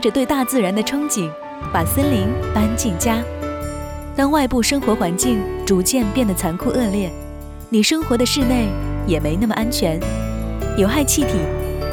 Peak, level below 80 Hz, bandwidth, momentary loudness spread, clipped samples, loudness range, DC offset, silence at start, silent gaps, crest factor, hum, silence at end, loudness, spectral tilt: -4 dBFS; -30 dBFS; over 20 kHz; 10 LU; under 0.1%; 1 LU; under 0.1%; 0 s; none; 16 dB; none; 0 s; -19 LUFS; -4.5 dB/octave